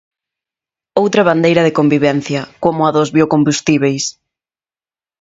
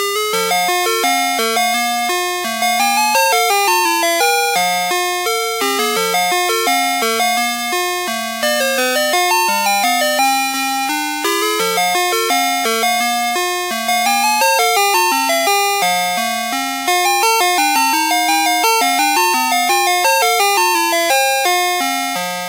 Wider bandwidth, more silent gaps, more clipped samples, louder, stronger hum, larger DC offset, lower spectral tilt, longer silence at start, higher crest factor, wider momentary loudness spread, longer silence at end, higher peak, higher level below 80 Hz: second, 8 kHz vs 16 kHz; neither; neither; about the same, -14 LUFS vs -14 LUFS; neither; neither; first, -5.5 dB/octave vs -0.5 dB/octave; first, 0.95 s vs 0 s; about the same, 14 dB vs 16 dB; first, 8 LU vs 5 LU; first, 1.1 s vs 0 s; about the same, 0 dBFS vs 0 dBFS; first, -54 dBFS vs -80 dBFS